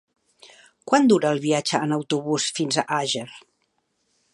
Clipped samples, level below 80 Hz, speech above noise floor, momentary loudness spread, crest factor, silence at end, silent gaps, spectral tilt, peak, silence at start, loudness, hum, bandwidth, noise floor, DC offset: under 0.1%; -70 dBFS; 50 dB; 9 LU; 20 dB; 0.95 s; none; -4 dB/octave; -4 dBFS; 0.45 s; -22 LUFS; none; 11.5 kHz; -71 dBFS; under 0.1%